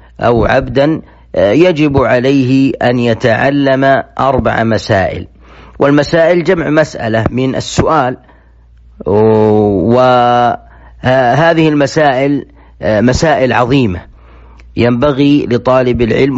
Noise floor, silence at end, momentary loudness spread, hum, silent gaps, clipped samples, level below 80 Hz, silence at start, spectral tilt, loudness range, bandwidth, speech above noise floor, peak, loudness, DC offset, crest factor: -41 dBFS; 0 s; 6 LU; none; none; under 0.1%; -34 dBFS; 0.2 s; -6.5 dB/octave; 2 LU; 8 kHz; 32 dB; 0 dBFS; -10 LUFS; under 0.1%; 10 dB